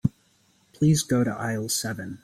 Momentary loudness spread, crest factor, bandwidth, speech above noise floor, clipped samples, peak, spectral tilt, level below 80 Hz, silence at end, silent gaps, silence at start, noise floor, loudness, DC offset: 8 LU; 18 dB; 16 kHz; 39 dB; under 0.1%; -8 dBFS; -5 dB/octave; -54 dBFS; 0.05 s; none; 0.05 s; -63 dBFS; -25 LUFS; under 0.1%